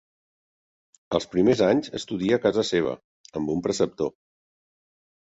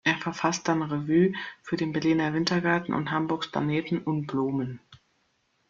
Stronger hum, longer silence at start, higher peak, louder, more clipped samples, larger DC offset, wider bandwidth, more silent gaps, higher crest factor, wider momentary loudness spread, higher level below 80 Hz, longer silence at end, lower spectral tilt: neither; first, 1.1 s vs 0.05 s; about the same, -8 dBFS vs -10 dBFS; first, -24 LUFS vs -27 LUFS; neither; neither; about the same, 8 kHz vs 7.6 kHz; first, 3.04-3.24 s vs none; about the same, 18 dB vs 18 dB; first, 11 LU vs 7 LU; first, -58 dBFS vs -64 dBFS; first, 1.15 s vs 0.75 s; about the same, -5.5 dB/octave vs -5.5 dB/octave